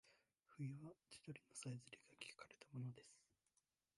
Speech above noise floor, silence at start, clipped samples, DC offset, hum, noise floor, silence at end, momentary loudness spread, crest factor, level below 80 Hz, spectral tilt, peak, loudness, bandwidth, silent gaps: 33 dB; 0.05 s; under 0.1%; under 0.1%; none; -88 dBFS; 0.75 s; 10 LU; 20 dB; under -90 dBFS; -5 dB/octave; -36 dBFS; -56 LUFS; 11.5 kHz; none